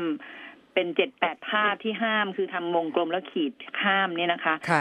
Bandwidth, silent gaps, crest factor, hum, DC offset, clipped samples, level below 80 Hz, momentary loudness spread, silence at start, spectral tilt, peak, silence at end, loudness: 10.5 kHz; none; 22 dB; none; under 0.1%; under 0.1%; -80 dBFS; 7 LU; 0 s; -5.5 dB/octave; -6 dBFS; 0 s; -26 LUFS